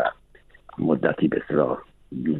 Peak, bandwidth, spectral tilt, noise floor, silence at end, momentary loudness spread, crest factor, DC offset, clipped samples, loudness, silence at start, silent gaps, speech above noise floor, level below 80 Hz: -6 dBFS; 4.1 kHz; -10 dB/octave; -53 dBFS; 0 s; 13 LU; 20 dB; under 0.1%; under 0.1%; -24 LUFS; 0 s; none; 30 dB; -56 dBFS